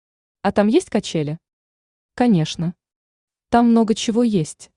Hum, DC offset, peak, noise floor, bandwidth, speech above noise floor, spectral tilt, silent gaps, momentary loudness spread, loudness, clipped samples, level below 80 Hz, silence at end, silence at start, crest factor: none; under 0.1%; -4 dBFS; under -90 dBFS; 11 kHz; over 72 dB; -6 dB/octave; 1.53-2.09 s, 2.96-3.28 s; 11 LU; -19 LUFS; under 0.1%; -52 dBFS; 0.15 s; 0.45 s; 16 dB